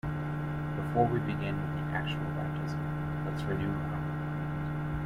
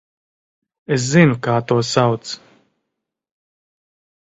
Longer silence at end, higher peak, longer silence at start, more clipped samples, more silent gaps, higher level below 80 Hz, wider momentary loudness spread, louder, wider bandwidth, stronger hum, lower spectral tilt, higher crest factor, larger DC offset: second, 0 s vs 1.85 s; second, -12 dBFS vs 0 dBFS; second, 0.05 s vs 0.9 s; neither; neither; first, -48 dBFS vs -56 dBFS; second, 6 LU vs 14 LU; second, -33 LUFS vs -17 LUFS; second, 6.4 kHz vs 8 kHz; neither; first, -8 dB/octave vs -5.5 dB/octave; about the same, 20 dB vs 20 dB; neither